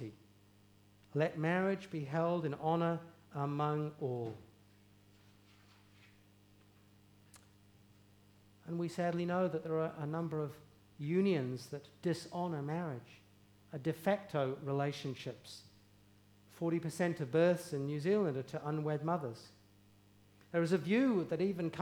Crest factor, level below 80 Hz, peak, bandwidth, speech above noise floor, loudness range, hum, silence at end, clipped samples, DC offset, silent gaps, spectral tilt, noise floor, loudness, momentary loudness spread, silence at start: 20 dB; -78 dBFS; -20 dBFS; 19.5 kHz; 29 dB; 6 LU; 50 Hz at -65 dBFS; 0 s; under 0.1%; under 0.1%; none; -7 dB/octave; -65 dBFS; -37 LUFS; 13 LU; 0 s